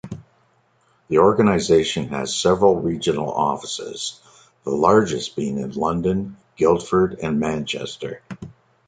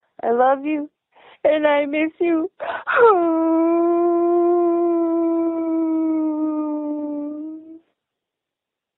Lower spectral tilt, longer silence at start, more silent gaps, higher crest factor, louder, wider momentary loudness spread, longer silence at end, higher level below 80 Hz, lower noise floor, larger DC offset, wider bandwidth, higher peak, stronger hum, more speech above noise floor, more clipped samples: second, -5 dB/octave vs -9 dB/octave; second, 0.05 s vs 0.25 s; neither; about the same, 20 dB vs 16 dB; about the same, -20 LUFS vs -19 LUFS; first, 17 LU vs 11 LU; second, 0.35 s vs 1.2 s; first, -48 dBFS vs -68 dBFS; second, -61 dBFS vs -85 dBFS; neither; first, 9.4 kHz vs 4 kHz; about the same, -2 dBFS vs -4 dBFS; neither; second, 42 dB vs 67 dB; neither